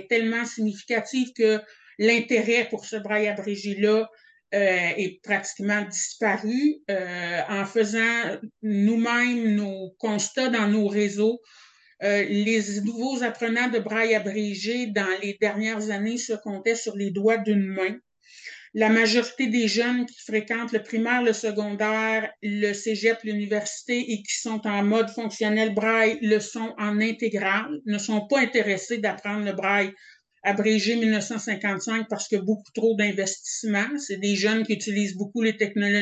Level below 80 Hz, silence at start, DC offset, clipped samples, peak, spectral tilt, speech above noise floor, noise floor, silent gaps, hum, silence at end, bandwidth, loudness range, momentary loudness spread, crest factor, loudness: -76 dBFS; 0 s; under 0.1%; under 0.1%; -6 dBFS; -4 dB/octave; 21 dB; -45 dBFS; none; none; 0 s; 8.8 kHz; 2 LU; 7 LU; 18 dB; -24 LUFS